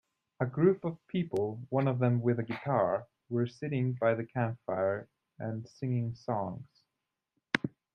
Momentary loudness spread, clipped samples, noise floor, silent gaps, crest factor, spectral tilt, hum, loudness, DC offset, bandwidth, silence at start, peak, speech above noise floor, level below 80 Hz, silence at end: 10 LU; under 0.1%; -87 dBFS; none; 24 dB; -8.5 dB/octave; none; -33 LUFS; under 0.1%; 9 kHz; 0.4 s; -8 dBFS; 56 dB; -72 dBFS; 0.25 s